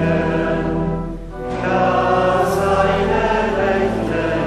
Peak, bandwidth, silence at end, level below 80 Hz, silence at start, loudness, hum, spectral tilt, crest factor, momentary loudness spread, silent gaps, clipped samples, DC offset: -2 dBFS; 14 kHz; 0 s; -32 dBFS; 0 s; -18 LUFS; none; -6.5 dB/octave; 14 dB; 7 LU; none; under 0.1%; under 0.1%